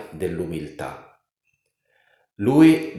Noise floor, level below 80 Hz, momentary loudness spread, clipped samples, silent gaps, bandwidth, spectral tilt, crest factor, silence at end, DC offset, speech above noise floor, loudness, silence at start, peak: -73 dBFS; -54 dBFS; 19 LU; under 0.1%; none; 12.5 kHz; -7 dB/octave; 20 dB; 0 s; under 0.1%; 54 dB; -20 LUFS; 0 s; -4 dBFS